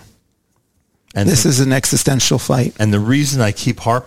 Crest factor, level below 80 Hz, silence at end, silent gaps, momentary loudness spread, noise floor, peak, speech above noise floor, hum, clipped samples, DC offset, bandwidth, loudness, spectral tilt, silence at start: 16 dB; -42 dBFS; 0 s; none; 5 LU; -63 dBFS; 0 dBFS; 49 dB; none; under 0.1%; 1%; 16.5 kHz; -15 LUFS; -4.5 dB/octave; 0 s